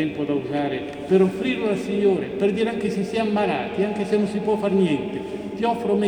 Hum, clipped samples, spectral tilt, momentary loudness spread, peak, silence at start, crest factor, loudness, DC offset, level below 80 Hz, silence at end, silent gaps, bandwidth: none; under 0.1%; -7 dB/octave; 6 LU; -6 dBFS; 0 s; 16 dB; -23 LUFS; under 0.1%; -56 dBFS; 0 s; none; 10.5 kHz